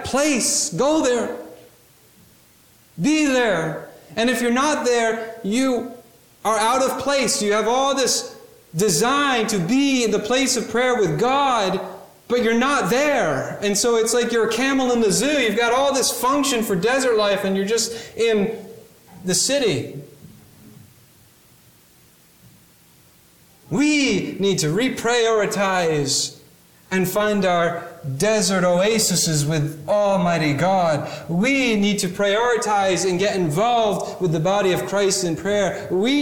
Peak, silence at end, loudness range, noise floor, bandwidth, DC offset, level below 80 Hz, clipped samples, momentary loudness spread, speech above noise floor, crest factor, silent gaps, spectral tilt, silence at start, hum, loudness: -8 dBFS; 0 s; 5 LU; -53 dBFS; 19 kHz; under 0.1%; -54 dBFS; under 0.1%; 6 LU; 34 dB; 14 dB; none; -3.5 dB/octave; 0 s; none; -19 LUFS